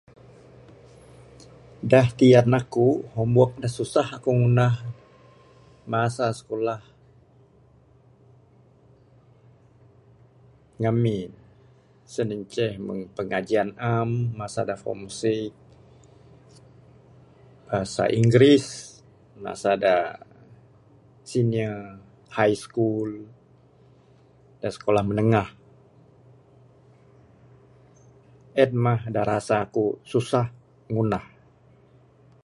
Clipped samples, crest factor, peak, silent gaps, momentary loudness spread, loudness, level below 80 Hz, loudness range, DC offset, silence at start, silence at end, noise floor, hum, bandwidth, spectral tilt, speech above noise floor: under 0.1%; 22 dB; -4 dBFS; none; 15 LU; -23 LUFS; -56 dBFS; 10 LU; under 0.1%; 1.8 s; 1.2 s; -56 dBFS; none; 11.5 kHz; -7 dB/octave; 34 dB